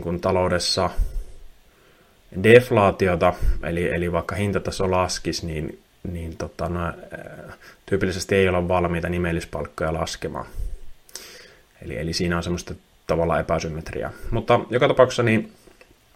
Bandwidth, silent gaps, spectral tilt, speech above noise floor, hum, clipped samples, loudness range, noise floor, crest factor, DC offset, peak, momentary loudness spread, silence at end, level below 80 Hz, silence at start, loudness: 16 kHz; none; -5.5 dB/octave; 33 dB; none; under 0.1%; 9 LU; -55 dBFS; 22 dB; under 0.1%; 0 dBFS; 20 LU; 0.65 s; -36 dBFS; 0 s; -22 LUFS